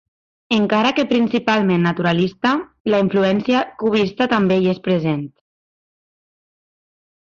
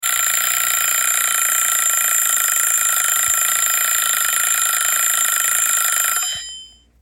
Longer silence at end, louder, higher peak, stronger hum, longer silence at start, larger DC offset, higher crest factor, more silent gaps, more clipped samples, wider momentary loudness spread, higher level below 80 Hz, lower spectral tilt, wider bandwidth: first, 2 s vs 0.35 s; second, -18 LUFS vs -15 LUFS; about the same, -4 dBFS vs -2 dBFS; neither; first, 0.5 s vs 0 s; neither; about the same, 14 dB vs 16 dB; first, 2.80-2.85 s vs none; neither; about the same, 4 LU vs 2 LU; about the same, -56 dBFS vs -58 dBFS; first, -7 dB/octave vs 4 dB/octave; second, 7.4 kHz vs 17 kHz